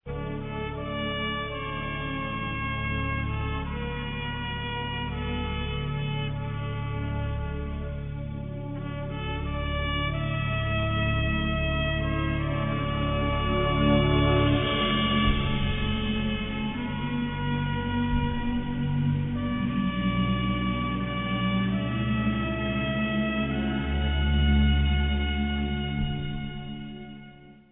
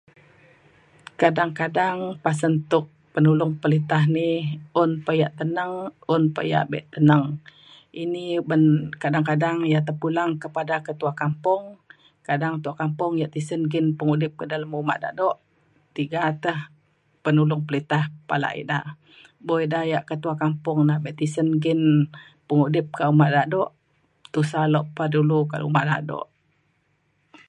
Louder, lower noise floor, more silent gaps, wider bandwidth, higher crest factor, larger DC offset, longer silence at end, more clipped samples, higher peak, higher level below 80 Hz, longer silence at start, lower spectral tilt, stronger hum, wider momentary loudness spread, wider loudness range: second, -28 LUFS vs -23 LUFS; second, -48 dBFS vs -68 dBFS; neither; second, 3.9 kHz vs 9.4 kHz; about the same, 18 dB vs 22 dB; neither; second, 0.1 s vs 1.25 s; neither; second, -10 dBFS vs -2 dBFS; first, -34 dBFS vs -68 dBFS; second, 0.05 s vs 1.2 s; first, -10 dB/octave vs -7.5 dB/octave; neither; about the same, 10 LU vs 10 LU; first, 7 LU vs 4 LU